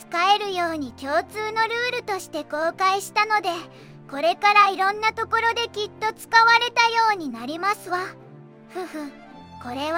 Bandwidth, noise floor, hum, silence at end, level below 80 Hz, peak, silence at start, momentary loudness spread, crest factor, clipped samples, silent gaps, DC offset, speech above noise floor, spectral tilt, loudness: 16.5 kHz; -45 dBFS; none; 0 s; -66 dBFS; -2 dBFS; 0 s; 17 LU; 20 dB; under 0.1%; none; under 0.1%; 23 dB; -2.5 dB/octave; -21 LUFS